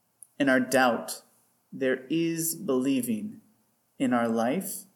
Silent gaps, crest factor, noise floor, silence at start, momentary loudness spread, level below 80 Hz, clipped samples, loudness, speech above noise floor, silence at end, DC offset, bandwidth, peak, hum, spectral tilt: none; 18 dB; -68 dBFS; 0.4 s; 11 LU; -80 dBFS; under 0.1%; -27 LUFS; 42 dB; 0.1 s; under 0.1%; 19 kHz; -10 dBFS; none; -4 dB/octave